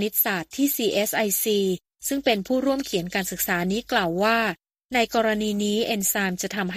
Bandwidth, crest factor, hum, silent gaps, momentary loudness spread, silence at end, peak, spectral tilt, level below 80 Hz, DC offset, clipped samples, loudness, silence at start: 15.5 kHz; 18 dB; none; 4.85-4.89 s; 6 LU; 0 s; -6 dBFS; -3.5 dB/octave; -56 dBFS; under 0.1%; under 0.1%; -23 LUFS; 0 s